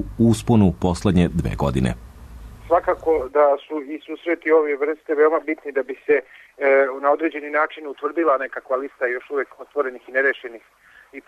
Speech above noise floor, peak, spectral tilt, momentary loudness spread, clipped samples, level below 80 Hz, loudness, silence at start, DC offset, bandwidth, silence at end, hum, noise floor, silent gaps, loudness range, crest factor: 19 dB; -6 dBFS; -7 dB/octave; 10 LU; under 0.1%; -40 dBFS; -21 LUFS; 0 s; under 0.1%; 13.5 kHz; 0.05 s; none; -39 dBFS; none; 3 LU; 16 dB